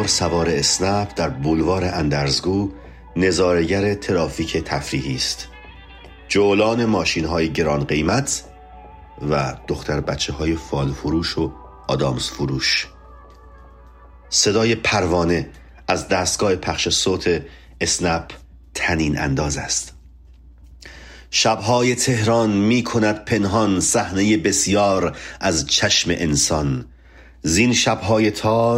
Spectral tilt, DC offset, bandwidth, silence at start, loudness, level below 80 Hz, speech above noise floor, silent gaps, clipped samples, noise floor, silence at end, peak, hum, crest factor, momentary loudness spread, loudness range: -4 dB/octave; under 0.1%; 16 kHz; 0 s; -19 LUFS; -40 dBFS; 26 dB; none; under 0.1%; -45 dBFS; 0 s; -2 dBFS; none; 18 dB; 8 LU; 5 LU